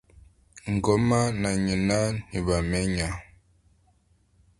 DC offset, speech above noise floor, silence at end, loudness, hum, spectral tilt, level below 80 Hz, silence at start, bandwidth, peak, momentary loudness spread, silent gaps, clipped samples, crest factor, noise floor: under 0.1%; 39 dB; 1.4 s; -26 LUFS; none; -5.5 dB/octave; -42 dBFS; 0.55 s; 11.5 kHz; -8 dBFS; 8 LU; none; under 0.1%; 20 dB; -64 dBFS